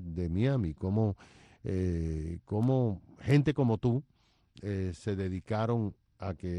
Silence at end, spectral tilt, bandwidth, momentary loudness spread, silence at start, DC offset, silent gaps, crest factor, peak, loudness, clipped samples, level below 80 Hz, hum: 0 s; -8.5 dB/octave; 10.5 kHz; 11 LU; 0 s; under 0.1%; none; 18 dB; -12 dBFS; -32 LUFS; under 0.1%; -50 dBFS; none